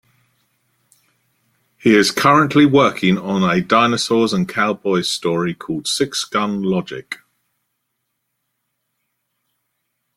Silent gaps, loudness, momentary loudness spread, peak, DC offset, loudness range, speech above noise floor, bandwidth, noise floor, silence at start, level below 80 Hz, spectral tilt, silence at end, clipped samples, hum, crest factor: none; -16 LUFS; 10 LU; 0 dBFS; under 0.1%; 11 LU; 58 dB; 15.5 kHz; -74 dBFS; 1.85 s; -56 dBFS; -4.5 dB/octave; 3 s; under 0.1%; none; 18 dB